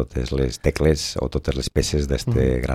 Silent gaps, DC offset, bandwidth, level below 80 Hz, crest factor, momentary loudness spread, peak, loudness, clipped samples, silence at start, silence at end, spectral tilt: none; under 0.1%; 15.5 kHz; -28 dBFS; 16 dB; 5 LU; -4 dBFS; -22 LUFS; under 0.1%; 0 s; 0 s; -5.5 dB/octave